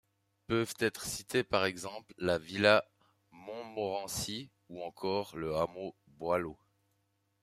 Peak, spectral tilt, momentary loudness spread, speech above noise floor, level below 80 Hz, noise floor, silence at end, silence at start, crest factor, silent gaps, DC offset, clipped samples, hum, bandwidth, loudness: -10 dBFS; -4 dB/octave; 16 LU; 44 dB; -66 dBFS; -78 dBFS; 0.9 s; 0.5 s; 26 dB; none; under 0.1%; under 0.1%; none; 15.5 kHz; -34 LUFS